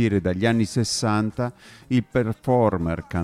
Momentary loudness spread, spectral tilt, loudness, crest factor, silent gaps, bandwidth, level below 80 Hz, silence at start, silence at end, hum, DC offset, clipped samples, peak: 6 LU; -6 dB/octave; -23 LUFS; 16 dB; none; 14 kHz; -48 dBFS; 0 s; 0 s; none; under 0.1%; under 0.1%; -6 dBFS